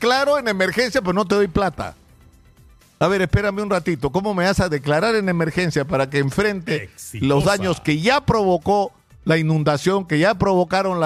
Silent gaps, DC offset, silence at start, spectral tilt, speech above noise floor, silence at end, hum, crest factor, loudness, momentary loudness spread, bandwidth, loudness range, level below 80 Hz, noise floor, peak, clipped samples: none; under 0.1%; 0 s; -5.5 dB/octave; 31 dB; 0 s; none; 16 dB; -19 LUFS; 5 LU; 15 kHz; 3 LU; -40 dBFS; -50 dBFS; -2 dBFS; under 0.1%